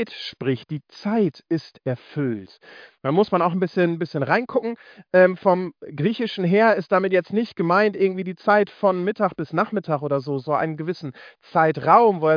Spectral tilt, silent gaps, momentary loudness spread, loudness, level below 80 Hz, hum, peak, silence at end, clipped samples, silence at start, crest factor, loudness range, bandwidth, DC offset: -8.5 dB/octave; none; 12 LU; -21 LUFS; -70 dBFS; none; -2 dBFS; 0 s; under 0.1%; 0 s; 20 dB; 4 LU; 5.2 kHz; under 0.1%